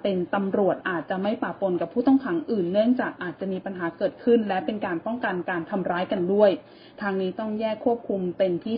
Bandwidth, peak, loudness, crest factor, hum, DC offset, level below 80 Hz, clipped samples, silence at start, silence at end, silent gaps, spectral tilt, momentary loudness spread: 5.2 kHz; -6 dBFS; -25 LUFS; 18 dB; none; under 0.1%; -64 dBFS; under 0.1%; 0.05 s; 0 s; none; -11 dB/octave; 8 LU